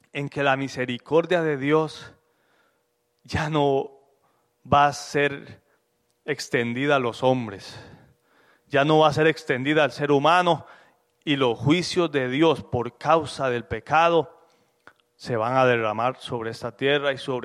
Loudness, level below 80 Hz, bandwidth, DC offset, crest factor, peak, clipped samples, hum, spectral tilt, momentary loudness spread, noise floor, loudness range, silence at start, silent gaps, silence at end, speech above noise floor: -23 LUFS; -58 dBFS; 13 kHz; under 0.1%; 18 dB; -6 dBFS; under 0.1%; none; -5.5 dB/octave; 12 LU; -71 dBFS; 4 LU; 0.15 s; none; 0 s; 49 dB